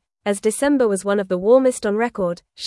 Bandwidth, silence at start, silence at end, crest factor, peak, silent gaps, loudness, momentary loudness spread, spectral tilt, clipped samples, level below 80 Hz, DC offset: 12 kHz; 0.25 s; 0 s; 16 dB; -4 dBFS; none; -19 LUFS; 9 LU; -5 dB/octave; under 0.1%; -56 dBFS; under 0.1%